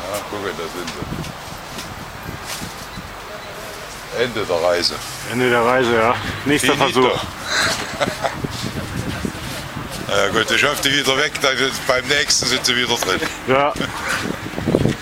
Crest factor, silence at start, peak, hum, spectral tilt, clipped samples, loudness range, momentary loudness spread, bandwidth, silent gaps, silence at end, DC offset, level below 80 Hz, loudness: 20 dB; 0 s; 0 dBFS; none; -3 dB/octave; under 0.1%; 11 LU; 15 LU; 16 kHz; none; 0 s; under 0.1%; -42 dBFS; -19 LUFS